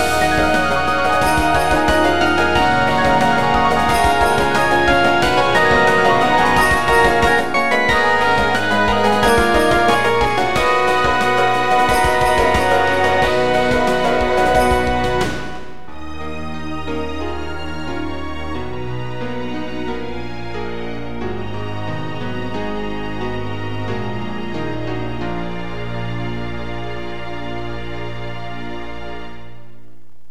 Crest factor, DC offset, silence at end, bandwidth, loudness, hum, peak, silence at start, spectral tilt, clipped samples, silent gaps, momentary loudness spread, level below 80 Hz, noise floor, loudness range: 16 dB; 5%; 0.7 s; 16.5 kHz; -17 LUFS; none; 0 dBFS; 0 s; -4.5 dB/octave; under 0.1%; none; 14 LU; -32 dBFS; -50 dBFS; 13 LU